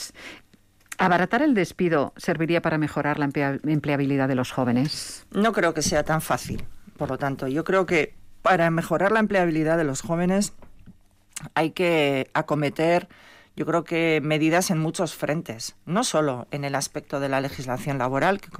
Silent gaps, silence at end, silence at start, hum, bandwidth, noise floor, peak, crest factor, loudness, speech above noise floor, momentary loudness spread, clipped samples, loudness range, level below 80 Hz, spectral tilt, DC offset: none; 0 s; 0 s; none; 16 kHz; -57 dBFS; -10 dBFS; 14 dB; -24 LUFS; 34 dB; 9 LU; under 0.1%; 2 LU; -52 dBFS; -5 dB/octave; under 0.1%